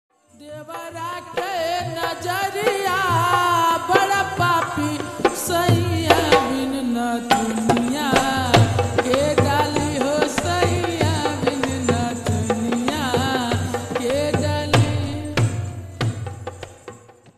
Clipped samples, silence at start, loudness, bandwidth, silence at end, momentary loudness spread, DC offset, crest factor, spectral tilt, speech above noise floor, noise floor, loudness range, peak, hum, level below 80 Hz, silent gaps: under 0.1%; 0.4 s; -20 LUFS; 13.5 kHz; 0.4 s; 10 LU; under 0.1%; 20 dB; -5 dB/octave; 17 dB; -42 dBFS; 4 LU; 0 dBFS; none; -46 dBFS; none